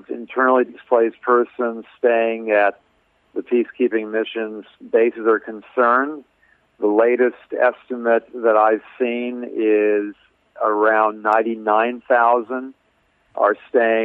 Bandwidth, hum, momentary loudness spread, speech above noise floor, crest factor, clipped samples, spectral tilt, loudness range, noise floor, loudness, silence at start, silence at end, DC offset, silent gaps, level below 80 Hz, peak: 4.1 kHz; none; 11 LU; 44 dB; 16 dB; under 0.1%; -7.5 dB/octave; 2 LU; -62 dBFS; -19 LUFS; 0.1 s; 0 s; under 0.1%; none; -72 dBFS; -4 dBFS